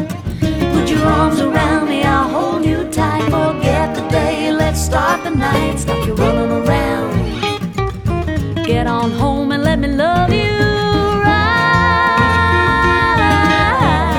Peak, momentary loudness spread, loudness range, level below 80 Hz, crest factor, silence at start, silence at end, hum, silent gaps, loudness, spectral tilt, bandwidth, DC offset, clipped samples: 0 dBFS; 7 LU; 5 LU; -26 dBFS; 14 dB; 0 s; 0 s; none; none; -14 LUFS; -6 dB/octave; 18 kHz; under 0.1%; under 0.1%